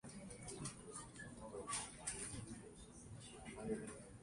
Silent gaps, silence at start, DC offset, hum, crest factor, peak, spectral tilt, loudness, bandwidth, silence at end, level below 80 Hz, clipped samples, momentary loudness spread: none; 0.05 s; under 0.1%; none; 22 dB; -30 dBFS; -3.5 dB/octave; -50 LUFS; 11.5 kHz; 0 s; -66 dBFS; under 0.1%; 10 LU